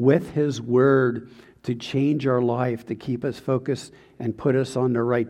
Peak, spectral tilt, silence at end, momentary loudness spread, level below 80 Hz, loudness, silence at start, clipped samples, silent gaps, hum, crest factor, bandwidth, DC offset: -6 dBFS; -7.5 dB/octave; 0 s; 12 LU; -60 dBFS; -23 LUFS; 0 s; under 0.1%; none; none; 18 dB; 11.5 kHz; under 0.1%